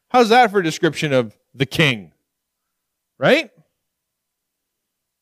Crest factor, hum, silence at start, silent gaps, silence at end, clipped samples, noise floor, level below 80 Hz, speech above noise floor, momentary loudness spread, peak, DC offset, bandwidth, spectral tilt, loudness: 18 dB; none; 0.15 s; none; 1.75 s; under 0.1%; -78 dBFS; -60 dBFS; 62 dB; 13 LU; -2 dBFS; under 0.1%; 15.5 kHz; -5 dB/octave; -17 LUFS